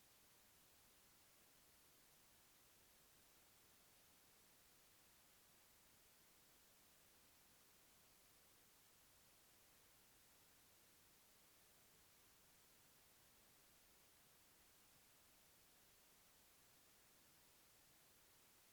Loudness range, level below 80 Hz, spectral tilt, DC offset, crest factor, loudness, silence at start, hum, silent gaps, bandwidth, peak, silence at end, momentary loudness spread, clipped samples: 0 LU; -88 dBFS; -1.5 dB/octave; under 0.1%; 14 dB; -70 LUFS; 0 s; none; none; over 20 kHz; -58 dBFS; 0 s; 0 LU; under 0.1%